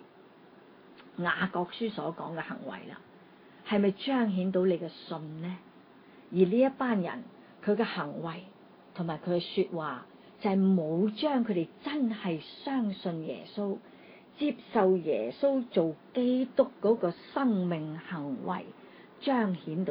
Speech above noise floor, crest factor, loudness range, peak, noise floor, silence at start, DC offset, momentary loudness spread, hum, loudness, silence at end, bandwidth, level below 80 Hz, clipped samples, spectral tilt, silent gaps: 26 dB; 20 dB; 5 LU; -12 dBFS; -56 dBFS; 0 s; under 0.1%; 13 LU; none; -31 LUFS; 0 s; 5.2 kHz; -76 dBFS; under 0.1%; -10.5 dB/octave; none